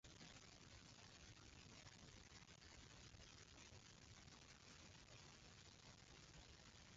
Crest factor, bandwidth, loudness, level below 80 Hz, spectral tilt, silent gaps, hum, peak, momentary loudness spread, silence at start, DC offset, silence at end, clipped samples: 14 dB; 7.6 kHz; -64 LUFS; -74 dBFS; -3 dB/octave; none; none; -50 dBFS; 2 LU; 0.05 s; under 0.1%; 0 s; under 0.1%